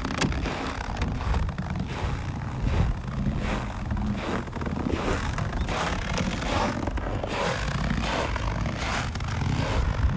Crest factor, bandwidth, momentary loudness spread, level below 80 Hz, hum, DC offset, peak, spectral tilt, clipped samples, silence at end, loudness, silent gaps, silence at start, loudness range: 16 dB; 8 kHz; 4 LU; -32 dBFS; none; under 0.1%; -10 dBFS; -5.5 dB/octave; under 0.1%; 0 s; -29 LUFS; none; 0 s; 2 LU